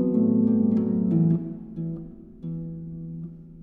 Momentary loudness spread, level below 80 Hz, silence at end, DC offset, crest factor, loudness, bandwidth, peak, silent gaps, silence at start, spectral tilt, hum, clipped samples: 17 LU; -54 dBFS; 0 s; under 0.1%; 14 dB; -24 LUFS; 2 kHz; -12 dBFS; none; 0 s; -13.5 dB/octave; none; under 0.1%